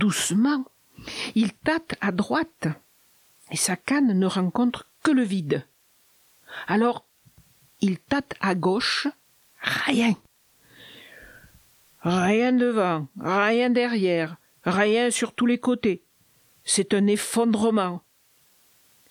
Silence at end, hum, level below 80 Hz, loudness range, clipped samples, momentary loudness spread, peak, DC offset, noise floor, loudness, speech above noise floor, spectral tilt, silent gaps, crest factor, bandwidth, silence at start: 1.1 s; none; -62 dBFS; 5 LU; under 0.1%; 11 LU; -6 dBFS; under 0.1%; -62 dBFS; -24 LUFS; 39 dB; -4.5 dB/octave; none; 20 dB; 19 kHz; 0 s